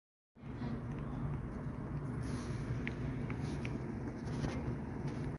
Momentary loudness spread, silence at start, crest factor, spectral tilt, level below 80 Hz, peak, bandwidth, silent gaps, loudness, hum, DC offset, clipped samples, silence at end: 3 LU; 0.35 s; 18 dB; -7.5 dB/octave; -50 dBFS; -24 dBFS; 11.5 kHz; none; -41 LUFS; none; under 0.1%; under 0.1%; 0 s